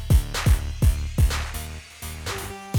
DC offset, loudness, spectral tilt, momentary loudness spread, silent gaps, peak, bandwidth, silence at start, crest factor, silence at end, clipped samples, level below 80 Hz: under 0.1%; -25 LUFS; -5 dB/octave; 13 LU; none; -6 dBFS; over 20 kHz; 0 s; 16 dB; 0 s; under 0.1%; -24 dBFS